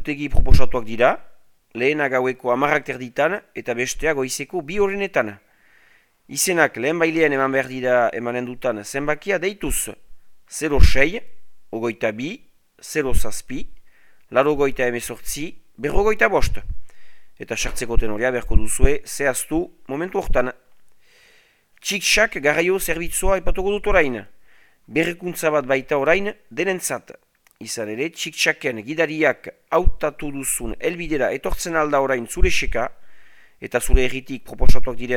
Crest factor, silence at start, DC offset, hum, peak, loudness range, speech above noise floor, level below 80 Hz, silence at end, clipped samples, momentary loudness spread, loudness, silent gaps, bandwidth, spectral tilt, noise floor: 18 dB; 0 s; under 0.1%; none; 0 dBFS; 4 LU; 38 dB; -26 dBFS; 0 s; 0.1%; 12 LU; -22 LUFS; none; 16.5 kHz; -4 dB/octave; -56 dBFS